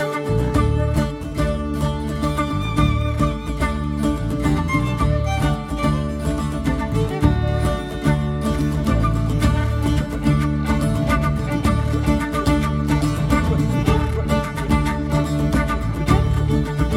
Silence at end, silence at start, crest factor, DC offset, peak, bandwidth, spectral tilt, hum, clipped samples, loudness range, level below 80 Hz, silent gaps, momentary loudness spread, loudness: 0 s; 0 s; 16 dB; under 0.1%; -2 dBFS; 15.5 kHz; -7 dB/octave; none; under 0.1%; 2 LU; -26 dBFS; none; 4 LU; -20 LUFS